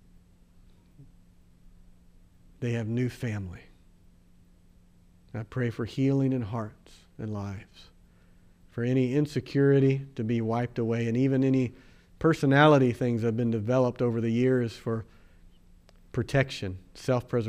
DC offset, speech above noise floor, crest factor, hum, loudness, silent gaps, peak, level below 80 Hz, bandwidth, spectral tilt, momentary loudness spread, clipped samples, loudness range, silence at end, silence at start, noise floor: under 0.1%; 31 dB; 20 dB; none; -27 LUFS; none; -8 dBFS; -56 dBFS; 11.5 kHz; -7.5 dB/octave; 15 LU; under 0.1%; 11 LU; 0 s; 1 s; -58 dBFS